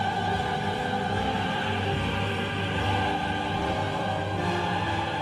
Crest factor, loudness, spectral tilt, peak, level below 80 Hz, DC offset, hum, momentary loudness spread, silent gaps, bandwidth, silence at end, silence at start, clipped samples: 12 dB; -27 LUFS; -5.5 dB/octave; -14 dBFS; -44 dBFS; under 0.1%; none; 2 LU; none; 13 kHz; 0 s; 0 s; under 0.1%